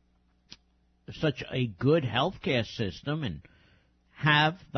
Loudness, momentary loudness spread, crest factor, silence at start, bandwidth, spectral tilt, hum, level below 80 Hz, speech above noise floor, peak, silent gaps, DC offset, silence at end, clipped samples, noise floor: -28 LUFS; 11 LU; 20 dB; 1.1 s; 6.6 kHz; -6.5 dB/octave; none; -58 dBFS; 39 dB; -10 dBFS; none; under 0.1%; 0 s; under 0.1%; -68 dBFS